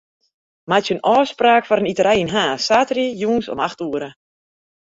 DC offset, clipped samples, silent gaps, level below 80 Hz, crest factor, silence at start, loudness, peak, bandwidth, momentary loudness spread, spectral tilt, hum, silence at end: under 0.1%; under 0.1%; none; -56 dBFS; 18 dB; 0.7 s; -18 LUFS; -2 dBFS; 8 kHz; 9 LU; -4.5 dB/octave; none; 0.85 s